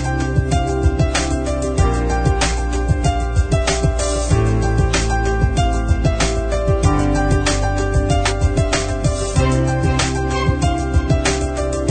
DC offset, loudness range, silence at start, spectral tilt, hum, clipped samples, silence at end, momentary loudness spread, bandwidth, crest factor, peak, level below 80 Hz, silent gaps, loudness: under 0.1%; 1 LU; 0 s; -5.5 dB/octave; none; under 0.1%; 0 s; 3 LU; 9.4 kHz; 14 dB; -4 dBFS; -20 dBFS; none; -18 LUFS